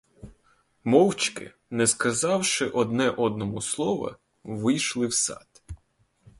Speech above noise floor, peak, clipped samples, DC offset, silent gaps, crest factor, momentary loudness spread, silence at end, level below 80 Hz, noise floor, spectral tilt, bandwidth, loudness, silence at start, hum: 42 dB; -4 dBFS; under 0.1%; under 0.1%; none; 22 dB; 21 LU; 0.65 s; -56 dBFS; -67 dBFS; -3.5 dB/octave; 12 kHz; -25 LUFS; 0.25 s; none